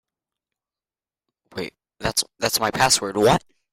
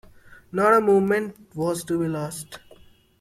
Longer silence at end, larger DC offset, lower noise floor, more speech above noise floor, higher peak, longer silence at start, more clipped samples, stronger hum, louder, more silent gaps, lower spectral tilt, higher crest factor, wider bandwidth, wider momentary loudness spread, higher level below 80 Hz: second, 0.35 s vs 0.65 s; neither; first, under -90 dBFS vs -52 dBFS; first, over 70 dB vs 30 dB; about the same, -4 dBFS vs -6 dBFS; first, 1.55 s vs 0.55 s; neither; neither; about the same, -20 LUFS vs -22 LUFS; neither; second, -2.5 dB/octave vs -6 dB/octave; about the same, 20 dB vs 18 dB; about the same, 16.5 kHz vs 15 kHz; second, 15 LU vs 18 LU; first, -50 dBFS vs -58 dBFS